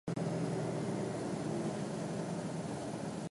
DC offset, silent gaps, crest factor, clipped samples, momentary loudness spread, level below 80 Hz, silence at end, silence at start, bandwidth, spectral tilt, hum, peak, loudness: under 0.1%; none; 12 dB; under 0.1%; 4 LU; -66 dBFS; 0 s; 0.05 s; 11.5 kHz; -6.5 dB/octave; none; -26 dBFS; -38 LUFS